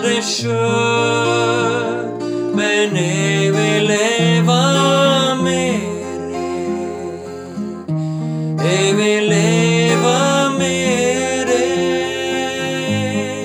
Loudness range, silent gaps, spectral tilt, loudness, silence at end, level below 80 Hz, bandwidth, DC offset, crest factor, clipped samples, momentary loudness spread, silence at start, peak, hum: 5 LU; none; -4.5 dB/octave; -16 LUFS; 0 s; -56 dBFS; 14.5 kHz; under 0.1%; 14 dB; under 0.1%; 10 LU; 0 s; -2 dBFS; none